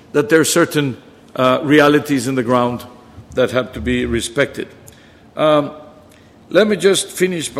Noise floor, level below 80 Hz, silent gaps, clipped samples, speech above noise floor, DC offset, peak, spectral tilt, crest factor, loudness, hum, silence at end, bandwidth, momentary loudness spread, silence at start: -45 dBFS; -42 dBFS; none; under 0.1%; 29 dB; under 0.1%; 0 dBFS; -4.5 dB/octave; 16 dB; -16 LUFS; none; 0 s; 15.5 kHz; 16 LU; 0.15 s